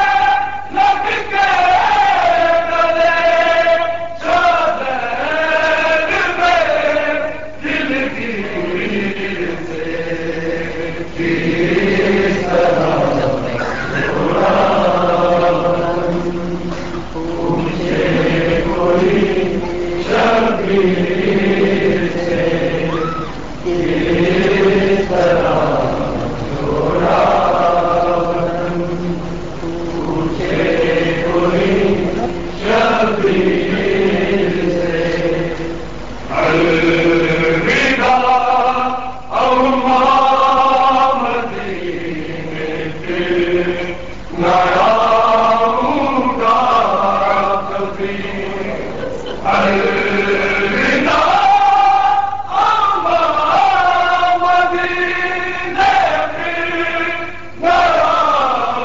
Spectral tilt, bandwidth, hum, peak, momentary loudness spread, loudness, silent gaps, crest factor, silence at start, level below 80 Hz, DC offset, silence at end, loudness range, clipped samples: -6 dB/octave; 7.8 kHz; none; -2 dBFS; 10 LU; -15 LUFS; none; 12 dB; 0 s; -36 dBFS; 3%; 0 s; 5 LU; under 0.1%